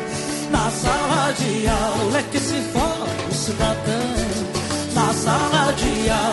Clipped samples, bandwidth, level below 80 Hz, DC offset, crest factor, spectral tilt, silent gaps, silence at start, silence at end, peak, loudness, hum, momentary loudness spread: under 0.1%; 12 kHz; -34 dBFS; under 0.1%; 16 dB; -4 dB/octave; none; 0 s; 0 s; -4 dBFS; -21 LUFS; none; 5 LU